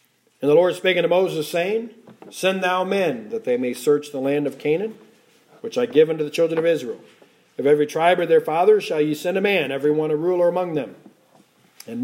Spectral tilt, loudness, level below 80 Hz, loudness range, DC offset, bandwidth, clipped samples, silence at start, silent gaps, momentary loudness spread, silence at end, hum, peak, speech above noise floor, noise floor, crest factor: -5.5 dB/octave; -20 LUFS; -76 dBFS; 4 LU; under 0.1%; 16.5 kHz; under 0.1%; 0.4 s; none; 11 LU; 0 s; none; -4 dBFS; 36 dB; -56 dBFS; 18 dB